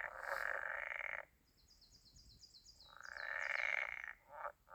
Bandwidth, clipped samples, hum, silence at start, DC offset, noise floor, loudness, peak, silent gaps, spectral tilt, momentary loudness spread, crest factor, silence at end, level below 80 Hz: over 20 kHz; under 0.1%; none; 0 s; under 0.1%; -71 dBFS; -43 LUFS; -24 dBFS; none; -1 dB/octave; 23 LU; 24 dB; 0 s; -74 dBFS